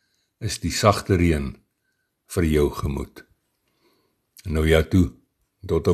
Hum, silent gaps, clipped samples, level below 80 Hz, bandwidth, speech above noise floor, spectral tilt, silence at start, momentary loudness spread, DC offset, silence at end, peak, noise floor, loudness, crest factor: none; none; under 0.1%; -34 dBFS; 13 kHz; 53 dB; -6 dB/octave; 0.4 s; 15 LU; under 0.1%; 0 s; -2 dBFS; -73 dBFS; -22 LUFS; 22 dB